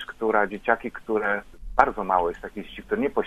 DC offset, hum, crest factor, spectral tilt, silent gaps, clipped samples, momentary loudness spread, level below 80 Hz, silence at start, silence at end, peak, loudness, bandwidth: under 0.1%; none; 24 dB; -6.5 dB/octave; none; under 0.1%; 9 LU; -46 dBFS; 0 s; 0 s; 0 dBFS; -25 LUFS; 13 kHz